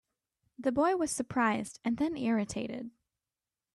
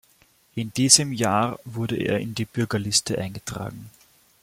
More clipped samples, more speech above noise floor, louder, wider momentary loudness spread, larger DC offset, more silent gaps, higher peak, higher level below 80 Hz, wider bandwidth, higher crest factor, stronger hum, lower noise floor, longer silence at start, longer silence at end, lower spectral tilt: neither; first, over 59 dB vs 36 dB; second, -32 LUFS vs -22 LUFS; second, 10 LU vs 18 LU; neither; neither; second, -16 dBFS vs 0 dBFS; second, -66 dBFS vs -56 dBFS; second, 12.5 kHz vs 16.5 kHz; second, 16 dB vs 26 dB; neither; first, under -90 dBFS vs -60 dBFS; about the same, 0.6 s vs 0.55 s; first, 0.85 s vs 0.55 s; first, -4.5 dB/octave vs -3 dB/octave